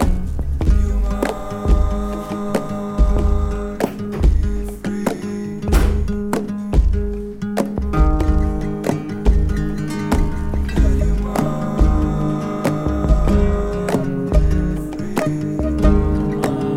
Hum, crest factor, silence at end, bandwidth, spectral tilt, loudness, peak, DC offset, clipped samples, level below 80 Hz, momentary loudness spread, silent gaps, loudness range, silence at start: none; 16 dB; 0 s; 14 kHz; -7.5 dB/octave; -20 LUFS; -2 dBFS; under 0.1%; under 0.1%; -20 dBFS; 7 LU; none; 2 LU; 0 s